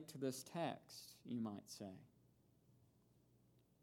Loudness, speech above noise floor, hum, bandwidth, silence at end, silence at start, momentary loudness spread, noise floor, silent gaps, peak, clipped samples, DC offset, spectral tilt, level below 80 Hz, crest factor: -49 LUFS; 26 dB; none; 19 kHz; 1.05 s; 0 s; 11 LU; -75 dBFS; none; -30 dBFS; under 0.1%; under 0.1%; -5 dB/octave; -88 dBFS; 22 dB